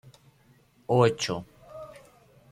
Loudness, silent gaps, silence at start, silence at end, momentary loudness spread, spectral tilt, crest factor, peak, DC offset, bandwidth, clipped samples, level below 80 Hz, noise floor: -26 LUFS; none; 0.9 s; 0.6 s; 24 LU; -5.5 dB/octave; 24 dB; -6 dBFS; under 0.1%; 13.5 kHz; under 0.1%; -64 dBFS; -61 dBFS